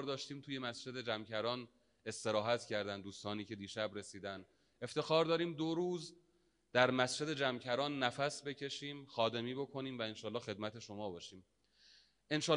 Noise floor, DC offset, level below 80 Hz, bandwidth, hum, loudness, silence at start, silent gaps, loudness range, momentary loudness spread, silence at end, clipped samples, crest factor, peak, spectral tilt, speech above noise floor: -76 dBFS; under 0.1%; -80 dBFS; 10.5 kHz; none; -39 LUFS; 0 s; none; 6 LU; 13 LU; 0 s; under 0.1%; 26 dB; -14 dBFS; -4 dB/octave; 37 dB